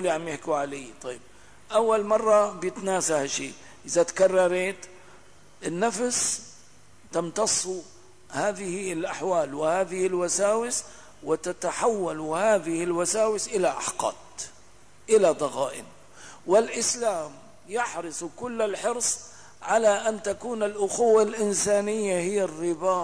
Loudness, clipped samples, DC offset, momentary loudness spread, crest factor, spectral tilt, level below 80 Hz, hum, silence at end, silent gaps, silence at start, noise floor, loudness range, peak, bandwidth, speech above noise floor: -25 LUFS; under 0.1%; 0.3%; 16 LU; 16 dB; -3 dB/octave; -64 dBFS; 50 Hz at -65 dBFS; 0 s; none; 0 s; -55 dBFS; 4 LU; -10 dBFS; 11 kHz; 30 dB